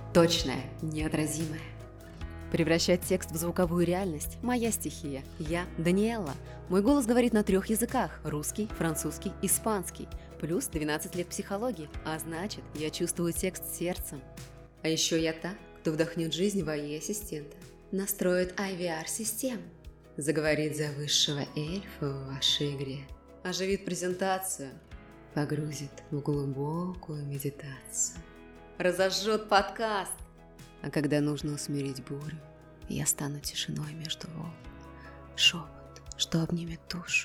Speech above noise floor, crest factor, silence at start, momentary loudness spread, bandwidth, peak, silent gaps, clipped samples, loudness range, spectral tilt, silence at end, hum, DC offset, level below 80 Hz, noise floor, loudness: 21 dB; 22 dB; 0 s; 17 LU; 18.5 kHz; -10 dBFS; none; under 0.1%; 5 LU; -4 dB/octave; 0 s; none; under 0.1%; -50 dBFS; -52 dBFS; -31 LUFS